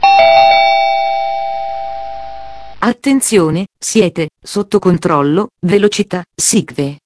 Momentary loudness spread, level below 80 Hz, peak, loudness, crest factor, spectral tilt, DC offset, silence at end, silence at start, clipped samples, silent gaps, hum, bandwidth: 15 LU; -46 dBFS; 0 dBFS; -12 LUFS; 12 dB; -4 dB/octave; under 0.1%; 0.05 s; 0 s; under 0.1%; none; none; 11 kHz